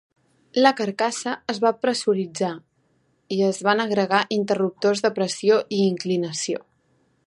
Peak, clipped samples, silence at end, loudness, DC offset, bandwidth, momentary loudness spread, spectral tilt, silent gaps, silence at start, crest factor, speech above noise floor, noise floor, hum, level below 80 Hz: -4 dBFS; under 0.1%; 0.65 s; -22 LUFS; under 0.1%; 11.5 kHz; 8 LU; -4.5 dB/octave; none; 0.55 s; 20 dB; 44 dB; -66 dBFS; none; -72 dBFS